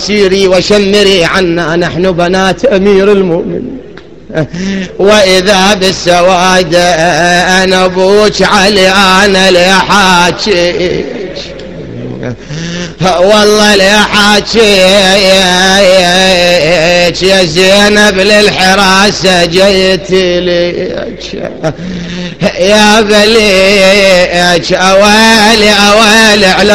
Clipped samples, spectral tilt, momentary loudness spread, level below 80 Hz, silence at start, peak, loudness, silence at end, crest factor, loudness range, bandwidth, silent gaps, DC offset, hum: 4%; -3.5 dB/octave; 14 LU; -30 dBFS; 0 s; 0 dBFS; -5 LUFS; 0 s; 6 dB; 6 LU; over 20 kHz; none; 3%; none